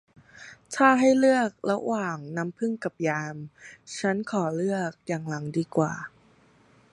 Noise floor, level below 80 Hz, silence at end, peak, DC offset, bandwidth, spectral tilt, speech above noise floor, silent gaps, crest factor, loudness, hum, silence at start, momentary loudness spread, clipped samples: -59 dBFS; -70 dBFS; 0.85 s; -4 dBFS; under 0.1%; 11.5 kHz; -6 dB/octave; 33 dB; none; 22 dB; -26 LUFS; none; 0.35 s; 22 LU; under 0.1%